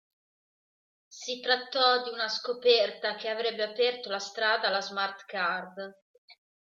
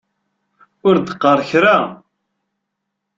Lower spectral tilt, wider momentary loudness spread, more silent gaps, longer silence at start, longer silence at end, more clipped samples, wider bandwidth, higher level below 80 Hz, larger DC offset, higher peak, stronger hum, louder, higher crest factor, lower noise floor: second, -1.5 dB/octave vs -6.5 dB/octave; first, 12 LU vs 6 LU; first, 6.02-6.28 s vs none; first, 1.1 s vs 0.85 s; second, 0.3 s vs 1.2 s; neither; about the same, 7.6 kHz vs 7.6 kHz; second, -86 dBFS vs -60 dBFS; neither; second, -8 dBFS vs -2 dBFS; neither; second, -28 LUFS vs -14 LUFS; first, 22 dB vs 16 dB; first, under -90 dBFS vs -77 dBFS